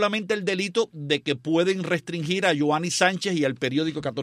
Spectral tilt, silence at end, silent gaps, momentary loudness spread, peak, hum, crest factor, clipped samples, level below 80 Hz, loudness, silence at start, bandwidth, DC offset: -4.5 dB/octave; 0 s; none; 5 LU; -6 dBFS; none; 18 dB; under 0.1%; -68 dBFS; -24 LUFS; 0 s; 15 kHz; under 0.1%